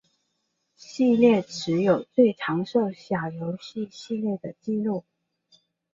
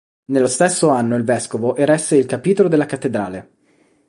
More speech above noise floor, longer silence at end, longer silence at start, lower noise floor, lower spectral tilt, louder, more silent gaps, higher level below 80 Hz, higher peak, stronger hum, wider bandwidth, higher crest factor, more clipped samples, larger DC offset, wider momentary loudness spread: first, 52 dB vs 41 dB; first, 0.95 s vs 0.65 s; first, 0.9 s vs 0.3 s; first, -76 dBFS vs -57 dBFS; first, -6.5 dB/octave vs -5 dB/octave; second, -25 LUFS vs -17 LUFS; neither; second, -68 dBFS vs -58 dBFS; second, -6 dBFS vs -2 dBFS; neither; second, 7.6 kHz vs 11.5 kHz; about the same, 18 dB vs 14 dB; neither; neither; first, 14 LU vs 7 LU